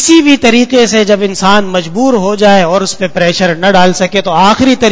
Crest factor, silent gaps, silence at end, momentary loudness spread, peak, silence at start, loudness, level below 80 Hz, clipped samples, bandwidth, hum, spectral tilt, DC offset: 8 dB; none; 0 s; 5 LU; 0 dBFS; 0 s; -8 LUFS; -40 dBFS; 2%; 8 kHz; none; -4 dB/octave; under 0.1%